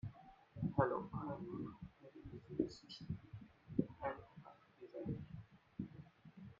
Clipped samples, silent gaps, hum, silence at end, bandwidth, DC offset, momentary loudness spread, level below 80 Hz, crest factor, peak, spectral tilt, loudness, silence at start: under 0.1%; none; none; 0.05 s; 7.2 kHz; under 0.1%; 20 LU; -68 dBFS; 26 dB; -20 dBFS; -7 dB/octave; -46 LUFS; 0.05 s